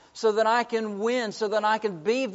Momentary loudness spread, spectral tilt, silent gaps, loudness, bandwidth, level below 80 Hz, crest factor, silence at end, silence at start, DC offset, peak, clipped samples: 4 LU; -2.5 dB/octave; none; -25 LUFS; 8 kHz; -76 dBFS; 16 dB; 0 s; 0.15 s; under 0.1%; -10 dBFS; under 0.1%